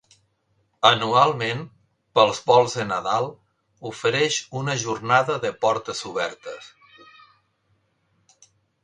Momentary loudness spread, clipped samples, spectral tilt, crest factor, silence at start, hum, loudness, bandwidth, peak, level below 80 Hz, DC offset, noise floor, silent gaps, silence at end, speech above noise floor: 16 LU; under 0.1%; -3.5 dB/octave; 24 dB; 0.8 s; none; -22 LUFS; 10.5 kHz; 0 dBFS; -64 dBFS; under 0.1%; -68 dBFS; none; 2.15 s; 47 dB